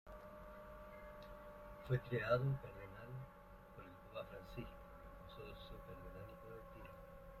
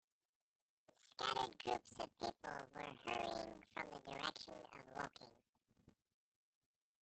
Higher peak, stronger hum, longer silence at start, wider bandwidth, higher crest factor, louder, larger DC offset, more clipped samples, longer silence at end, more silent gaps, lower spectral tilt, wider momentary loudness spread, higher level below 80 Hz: about the same, -24 dBFS vs -24 dBFS; neither; second, 0.05 s vs 1.05 s; first, 13.5 kHz vs 8.8 kHz; about the same, 24 dB vs 26 dB; about the same, -48 LUFS vs -47 LUFS; neither; neither; second, 0 s vs 1.1 s; second, none vs 5.49-5.53 s; first, -8 dB/octave vs -3 dB/octave; first, 18 LU vs 12 LU; first, -62 dBFS vs -78 dBFS